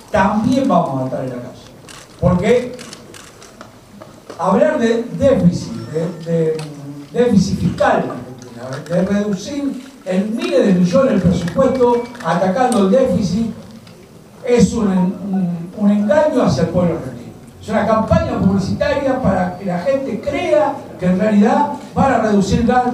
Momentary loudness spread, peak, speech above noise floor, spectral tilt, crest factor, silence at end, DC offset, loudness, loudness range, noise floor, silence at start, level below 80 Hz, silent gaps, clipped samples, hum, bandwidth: 16 LU; 0 dBFS; 25 dB; -7 dB/octave; 16 dB; 0 s; under 0.1%; -16 LUFS; 3 LU; -40 dBFS; 0 s; -40 dBFS; none; under 0.1%; none; 12.5 kHz